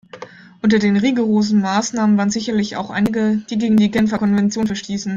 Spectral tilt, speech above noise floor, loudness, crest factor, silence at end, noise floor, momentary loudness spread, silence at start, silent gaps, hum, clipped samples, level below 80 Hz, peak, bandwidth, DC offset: -5.5 dB/octave; 21 dB; -17 LUFS; 12 dB; 0 s; -38 dBFS; 7 LU; 0.15 s; none; none; under 0.1%; -52 dBFS; -4 dBFS; 7.6 kHz; under 0.1%